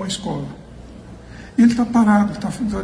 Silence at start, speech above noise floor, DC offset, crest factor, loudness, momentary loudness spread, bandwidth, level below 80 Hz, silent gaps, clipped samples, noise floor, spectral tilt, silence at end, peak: 0 s; 21 dB; under 0.1%; 16 dB; -18 LUFS; 24 LU; 11 kHz; -42 dBFS; none; under 0.1%; -38 dBFS; -6 dB/octave; 0 s; -4 dBFS